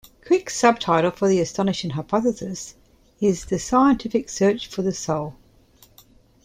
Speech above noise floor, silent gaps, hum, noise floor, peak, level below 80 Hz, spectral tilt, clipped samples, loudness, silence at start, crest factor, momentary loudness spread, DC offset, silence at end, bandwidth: 33 dB; none; none; -54 dBFS; -2 dBFS; -50 dBFS; -5 dB/octave; under 0.1%; -22 LUFS; 0.25 s; 20 dB; 10 LU; under 0.1%; 1.1 s; 15.5 kHz